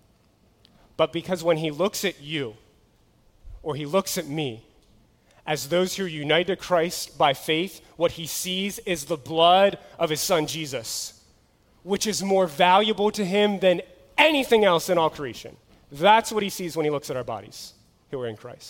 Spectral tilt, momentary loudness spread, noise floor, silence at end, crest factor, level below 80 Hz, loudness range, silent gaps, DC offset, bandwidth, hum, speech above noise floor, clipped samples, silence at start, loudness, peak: -3.5 dB/octave; 16 LU; -61 dBFS; 0 s; 22 dB; -56 dBFS; 8 LU; none; under 0.1%; 17 kHz; none; 37 dB; under 0.1%; 1 s; -23 LUFS; -2 dBFS